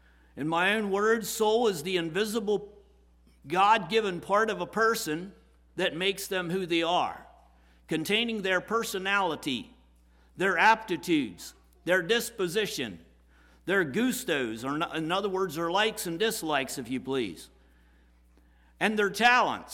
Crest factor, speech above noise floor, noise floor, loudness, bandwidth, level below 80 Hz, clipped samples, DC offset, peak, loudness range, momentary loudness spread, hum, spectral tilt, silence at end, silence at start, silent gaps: 20 dB; 32 dB; -60 dBFS; -28 LUFS; 18 kHz; -60 dBFS; under 0.1%; under 0.1%; -10 dBFS; 3 LU; 11 LU; none; -3.5 dB/octave; 0 s; 0.35 s; none